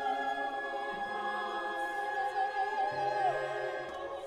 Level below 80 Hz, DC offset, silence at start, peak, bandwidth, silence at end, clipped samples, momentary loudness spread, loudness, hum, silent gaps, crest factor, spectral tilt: -70 dBFS; under 0.1%; 0 s; -20 dBFS; 13.5 kHz; 0 s; under 0.1%; 5 LU; -35 LUFS; none; none; 14 dB; -4 dB/octave